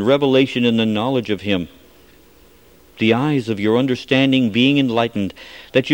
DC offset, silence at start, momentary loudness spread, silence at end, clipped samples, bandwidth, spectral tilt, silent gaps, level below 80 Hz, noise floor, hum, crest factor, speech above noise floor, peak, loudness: 0.2%; 0 s; 8 LU; 0 s; under 0.1%; 16.5 kHz; -6.5 dB/octave; none; -54 dBFS; -49 dBFS; none; 18 dB; 32 dB; 0 dBFS; -17 LUFS